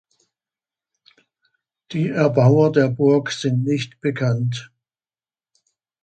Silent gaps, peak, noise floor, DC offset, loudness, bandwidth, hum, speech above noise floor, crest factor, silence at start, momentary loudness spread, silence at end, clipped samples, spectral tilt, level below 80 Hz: none; -2 dBFS; under -90 dBFS; under 0.1%; -19 LUFS; 8.8 kHz; none; over 72 dB; 18 dB; 1.9 s; 11 LU; 1.4 s; under 0.1%; -7 dB/octave; -62 dBFS